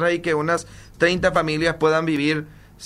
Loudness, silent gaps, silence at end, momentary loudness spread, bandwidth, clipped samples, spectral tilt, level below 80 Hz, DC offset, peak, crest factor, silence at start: -21 LUFS; none; 0 s; 6 LU; 14 kHz; under 0.1%; -5 dB/octave; -46 dBFS; under 0.1%; -4 dBFS; 18 dB; 0 s